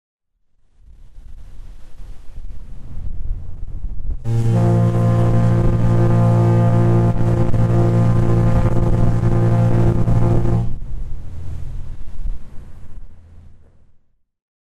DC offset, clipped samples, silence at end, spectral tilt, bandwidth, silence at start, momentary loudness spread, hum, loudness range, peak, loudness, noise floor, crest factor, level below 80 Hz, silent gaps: under 0.1%; under 0.1%; 1.05 s; -9.5 dB/octave; 7.6 kHz; 1 s; 19 LU; none; 20 LU; -6 dBFS; -16 LUFS; -57 dBFS; 10 dB; -26 dBFS; none